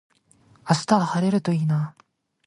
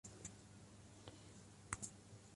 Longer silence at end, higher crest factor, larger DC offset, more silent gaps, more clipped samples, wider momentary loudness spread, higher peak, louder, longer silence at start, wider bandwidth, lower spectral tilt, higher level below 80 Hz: first, 0.55 s vs 0 s; second, 20 dB vs 32 dB; neither; neither; neither; about the same, 10 LU vs 12 LU; first, -4 dBFS vs -26 dBFS; first, -23 LUFS vs -55 LUFS; first, 0.65 s vs 0.05 s; about the same, 11.5 kHz vs 11.5 kHz; first, -6.5 dB/octave vs -3 dB/octave; first, -64 dBFS vs -70 dBFS